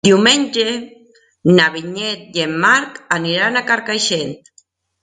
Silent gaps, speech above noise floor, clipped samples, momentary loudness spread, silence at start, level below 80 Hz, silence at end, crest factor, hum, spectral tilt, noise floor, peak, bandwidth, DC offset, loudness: none; 39 dB; under 0.1%; 10 LU; 0.05 s; -58 dBFS; 0.65 s; 16 dB; none; -3.5 dB/octave; -55 dBFS; 0 dBFS; 9.6 kHz; under 0.1%; -15 LUFS